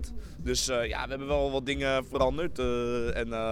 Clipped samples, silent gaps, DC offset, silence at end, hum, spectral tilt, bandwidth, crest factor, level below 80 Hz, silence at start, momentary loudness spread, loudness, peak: under 0.1%; none; under 0.1%; 0 s; none; -4 dB/octave; 16.5 kHz; 16 dB; -40 dBFS; 0 s; 5 LU; -30 LUFS; -12 dBFS